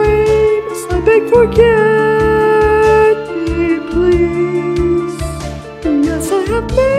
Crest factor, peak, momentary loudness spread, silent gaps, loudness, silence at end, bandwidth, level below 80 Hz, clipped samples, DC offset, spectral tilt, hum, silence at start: 12 dB; 0 dBFS; 9 LU; none; -12 LUFS; 0 s; 14.5 kHz; -26 dBFS; under 0.1%; under 0.1%; -6.5 dB/octave; none; 0 s